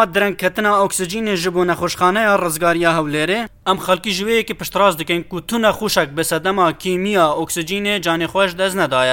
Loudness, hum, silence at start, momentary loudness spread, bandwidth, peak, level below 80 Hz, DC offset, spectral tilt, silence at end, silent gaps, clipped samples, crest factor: -17 LUFS; none; 0 s; 5 LU; 17 kHz; 0 dBFS; -46 dBFS; under 0.1%; -3.5 dB/octave; 0 s; none; under 0.1%; 16 dB